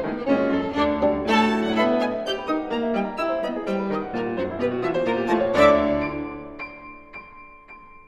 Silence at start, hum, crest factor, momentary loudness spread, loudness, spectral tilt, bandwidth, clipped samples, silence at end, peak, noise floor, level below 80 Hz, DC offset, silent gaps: 0 s; none; 18 dB; 17 LU; -23 LUFS; -6 dB/octave; 12.5 kHz; under 0.1%; 0.1 s; -4 dBFS; -45 dBFS; -48 dBFS; under 0.1%; none